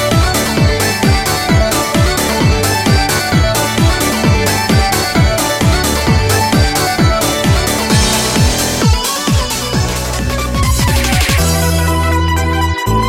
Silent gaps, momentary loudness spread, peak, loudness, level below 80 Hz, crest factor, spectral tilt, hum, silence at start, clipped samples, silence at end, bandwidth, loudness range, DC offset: none; 3 LU; 0 dBFS; -12 LUFS; -20 dBFS; 12 dB; -4 dB/octave; none; 0 s; under 0.1%; 0 s; 17 kHz; 2 LU; under 0.1%